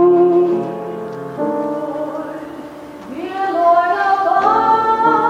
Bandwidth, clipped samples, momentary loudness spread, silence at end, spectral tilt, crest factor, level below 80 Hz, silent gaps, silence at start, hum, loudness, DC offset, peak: 7.6 kHz; under 0.1%; 17 LU; 0 s; -7 dB/octave; 14 dB; -56 dBFS; none; 0 s; none; -16 LUFS; under 0.1%; -2 dBFS